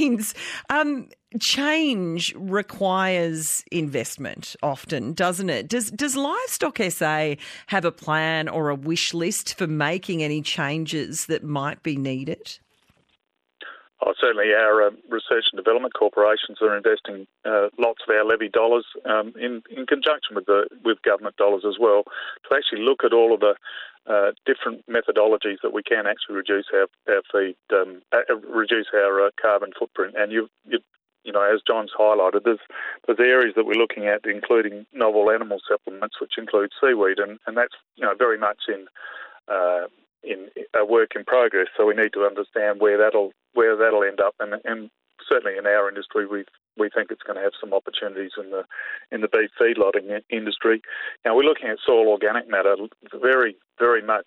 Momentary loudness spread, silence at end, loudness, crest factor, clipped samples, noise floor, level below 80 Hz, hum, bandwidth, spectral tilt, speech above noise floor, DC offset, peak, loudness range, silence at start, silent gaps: 12 LU; 0.05 s; -22 LUFS; 14 dB; under 0.1%; -71 dBFS; -70 dBFS; none; 13.5 kHz; -3.5 dB/octave; 49 dB; under 0.1%; -8 dBFS; 5 LU; 0 s; none